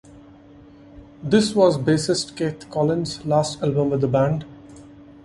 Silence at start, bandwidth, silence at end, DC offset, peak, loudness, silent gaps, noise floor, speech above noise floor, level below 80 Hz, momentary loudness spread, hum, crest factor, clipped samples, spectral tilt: 0.15 s; 11.5 kHz; 0.15 s; under 0.1%; -2 dBFS; -21 LUFS; none; -46 dBFS; 26 dB; -52 dBFS; 9 LU; none; 20 dB; under 0.1%; -6 dB/octave